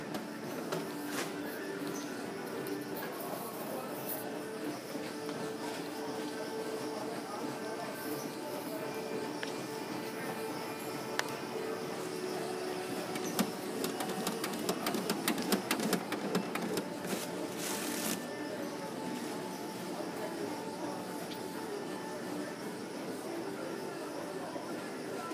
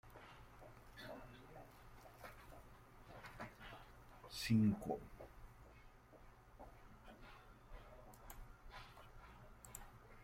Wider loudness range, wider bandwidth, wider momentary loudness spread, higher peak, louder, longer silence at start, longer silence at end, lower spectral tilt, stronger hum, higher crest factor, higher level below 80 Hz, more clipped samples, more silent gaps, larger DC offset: second, 6 LU vs 17 LU; about the same, 15.5 kHz vs 16.5 kHz; second, 6 LU vs 18 LU; first, -12 dBFS vs -26 dBFS; first, -38 LUFS vs -46 LUFS; about the same, 0 s vs 0.05 s; about the same, 0 s vs 0 s; second, -4 dB/octave vs -6 dB/octave; neither; about the same, 26 dB vs 24 dB; second, -80 dBFS vs -64 dBFS; neither; neither; neither